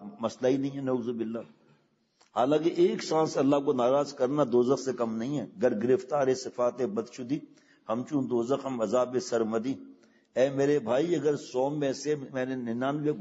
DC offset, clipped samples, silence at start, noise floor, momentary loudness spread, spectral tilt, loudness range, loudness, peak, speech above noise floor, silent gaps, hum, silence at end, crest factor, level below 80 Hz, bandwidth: under 0.1%; under 0.1%; 0 s; -67 dBFS; 10 LU; -6 dB/octave; 4 LU; -29 LUFS; -12 dBFS; 39 dB; none; none; 0 s; 18 dB; -76 dBFS; 8 kHz